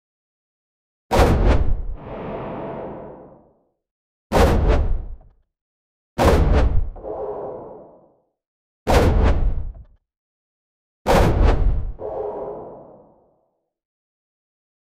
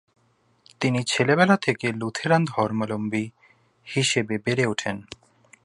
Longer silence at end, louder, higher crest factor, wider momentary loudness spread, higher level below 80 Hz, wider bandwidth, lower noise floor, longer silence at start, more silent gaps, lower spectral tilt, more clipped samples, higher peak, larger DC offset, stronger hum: first, 2.15 s vs 0.65 s; about the same, -21 LUFS vs -23 LUFS; about the same, 18 dB vs 22 dB; first, 17 LU vs 12 LU; first, -24 dBFS vs -62 dBFS; first, 15.5 kHz vs 11.5 kHz; first, -69 dBFS vs -65 dBFS; first, 1.1 s vs 0.8 s; first, 3.91-4.30 s, 5.61-6.16 s, 8.47-8.86 s, 10.17-11.05 s vs none; first, -6.5 dB/octave vs -5 dB/octave; neither; about the same, -2 dBFS vs -4 dBFS; neither; neither